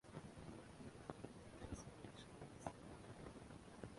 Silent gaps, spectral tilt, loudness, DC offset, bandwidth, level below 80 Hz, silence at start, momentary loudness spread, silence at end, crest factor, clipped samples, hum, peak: none; -5.5 dB/octave; -57 LUFS; under 0.1%; 11.5 kHz; -68 dBFS; 0.05 s; 4 LU; 0 s; 26 dB; under 0.1%; none; -30 dBFS